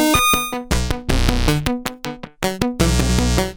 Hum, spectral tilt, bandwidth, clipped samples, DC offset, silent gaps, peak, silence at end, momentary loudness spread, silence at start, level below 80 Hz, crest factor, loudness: none; -4 dB/octave; over 20 kHz; under 0.1%; under 0.1%; none; 0 dBFS; 0 s; 10 LU; 0 s; -24 dBFS; 18 dB; -19 LUFS